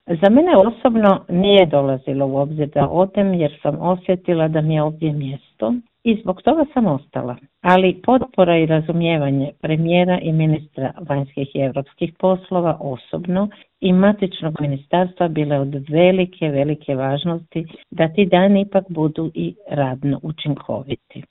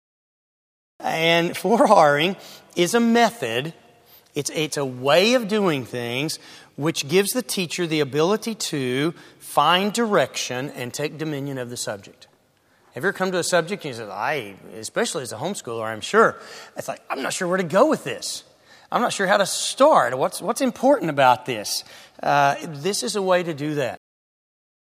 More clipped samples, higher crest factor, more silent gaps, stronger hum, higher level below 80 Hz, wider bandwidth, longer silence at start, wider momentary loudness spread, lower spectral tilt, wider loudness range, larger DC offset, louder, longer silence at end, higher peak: neither; about the same, 18 dB vs 22 dB; neither; neither; first, -50 dBFS vs -72 dBFS; second, 4.1 kHz vs 15.5 kHz; second, 0.1 s vs 1 s; about the same, 11 LU vs 12 LU; first, -10 dB/octave vs -4 dB/octave; second, 3 LU vs 7 LU; neither; first, -18 LUFS vs -21 LUFS; second, 0.1 s vs 1 s; about the same, 0 dBFS vs 0 dBFS